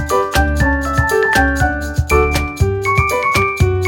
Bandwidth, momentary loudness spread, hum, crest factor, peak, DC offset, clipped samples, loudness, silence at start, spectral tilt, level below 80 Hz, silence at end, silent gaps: 18.5 kHz; 4 LU; none; 14 dB; 0 dBFS; under 0.1%; under 0.1%; -15 LUFS; 0 s; -5.5 dB/octave; -22 dBFS; 0 s; none